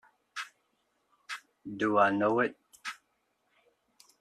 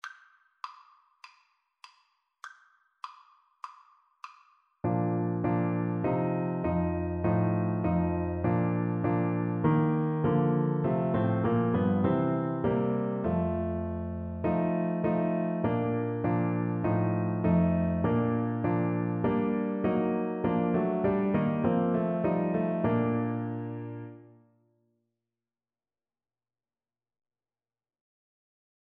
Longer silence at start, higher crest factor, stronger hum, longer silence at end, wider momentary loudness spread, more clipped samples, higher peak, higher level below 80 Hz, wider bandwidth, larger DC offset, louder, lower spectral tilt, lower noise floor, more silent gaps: first, 0.35 s vs 0.05 s; first, 24 dB vs 16 dB; neither; second, 1.25 s vs 4.65 s; about the same, 19 LU vs 17 LU; neither; first, -10 dBFS vs -14 dBFS; second, -76 dBFS vs -54 dBFS; first, 13.5 kHz vs 5 kHz; neither; about the same, -30 LUFS vs -29 LUFS; second, -5.5 dB/octave vs -10.5 dB/octave; second, -76 dBFS vs under -90 dBFS; neither